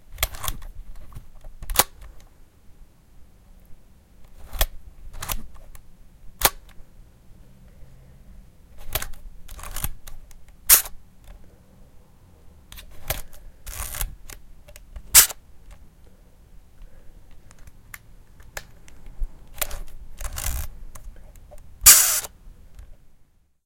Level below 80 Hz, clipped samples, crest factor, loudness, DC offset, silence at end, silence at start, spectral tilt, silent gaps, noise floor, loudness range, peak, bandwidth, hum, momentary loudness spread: -38 dBFS; under 0.1%; 28 dB; -19 LUFS; under 0.1%; 0.5 s; 0.1 s; 0 dB/octave; none; -56 dBFS; 18 LU; 0 dBFS; 17 kHz; none; 30 LU